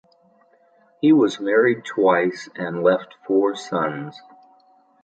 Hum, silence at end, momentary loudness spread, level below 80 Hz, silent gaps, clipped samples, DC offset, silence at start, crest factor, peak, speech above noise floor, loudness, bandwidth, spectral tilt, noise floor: none; 0.85 s; 11 LU; -72 dBFS; none; under 0.1%; under 0.1%; 1.05 s; 18 dB; -4 dBFS; 38 dB; -20 LUFS; 9 kHz; -6 dB/octave; -58 dBFS